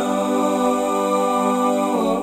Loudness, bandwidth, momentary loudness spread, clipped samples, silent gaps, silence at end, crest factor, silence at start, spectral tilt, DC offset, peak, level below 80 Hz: -19 LUFS; 16 kHz; 1 LU; under 0.1%; none; 0 s; 12 dB; 0 s; -5 dB/octave; under 0.1%; -6 dBFS; -58 dBFS